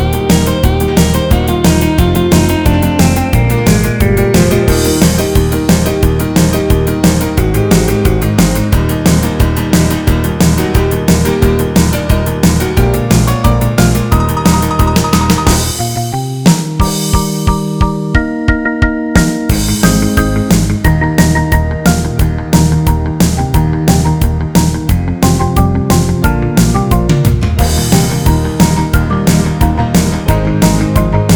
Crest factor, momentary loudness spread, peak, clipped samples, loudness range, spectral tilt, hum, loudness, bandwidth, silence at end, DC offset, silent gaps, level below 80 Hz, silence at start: 10 dB; 3 LU; 0 dBFS; 0.3%; 2 LU; -5.5 dB/octave; none; -11 LUFS; over 20 kHz; 0 s; under 0.1%; none; -18 dBFS; 0 s